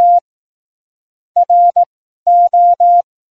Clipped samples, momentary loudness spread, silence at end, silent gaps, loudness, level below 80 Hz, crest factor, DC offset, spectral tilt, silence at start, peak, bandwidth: under 0.1%; 10 LU; 0.3 s; 0.21-1.35 s, 1.86-2.26 s; -11 LUFS; -64 dBFS; 8 dB; 0.3%; -4.5 dB/octave; 0 s; -4 dBFS; 1.2 kHz